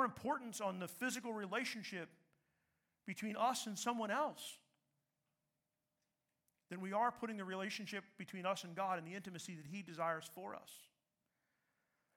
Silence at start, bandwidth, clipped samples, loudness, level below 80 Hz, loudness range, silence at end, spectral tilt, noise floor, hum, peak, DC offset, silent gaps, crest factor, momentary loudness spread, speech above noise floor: 0 s; 18 kHz; under 0.1%; -43 LUFS; -88 dBFS; 4 LU; 1.3 s; -3.5 dB/octave; -90 dBFS; none; -24 dBFS; under 0.1%; none; 20 dB; 13 LU; 46 dB